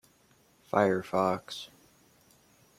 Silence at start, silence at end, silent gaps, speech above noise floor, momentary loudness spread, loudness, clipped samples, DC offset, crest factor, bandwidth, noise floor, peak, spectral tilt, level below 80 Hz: 0.75 s; 1.15 s; none; 36 dB; 15 LU; -30 LUFS; under 0.1%; under 0.1%; 24 dB; 16 kHz; -65 dBFS; -8 dBFS; -6 dB/octave; -72 dBFS